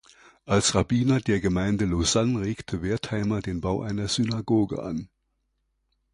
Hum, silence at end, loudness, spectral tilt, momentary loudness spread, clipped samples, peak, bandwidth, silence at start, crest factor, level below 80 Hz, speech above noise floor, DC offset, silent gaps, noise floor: none; 1.05 s; -25 LUFS; -5 dB/octave; 7 LU; under 0.1%; -6 dBFS; 11 kHz; 0.45 s; 18 dB; -44 dBFS; 50 dB; under 0.1%; none; -75 dBFS